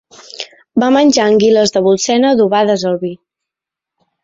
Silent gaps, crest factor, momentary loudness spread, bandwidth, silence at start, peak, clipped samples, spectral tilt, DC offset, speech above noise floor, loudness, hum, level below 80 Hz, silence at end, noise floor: none; 12 dB; 15 LU; 8 kHz; 0.35 s; -2 dBFS; under 0.1%; -4.5 dB/octave; under 0.1%; 73 dB; -12 LUFS; none; -56 dBFS; 1.1 s; -84 dBFS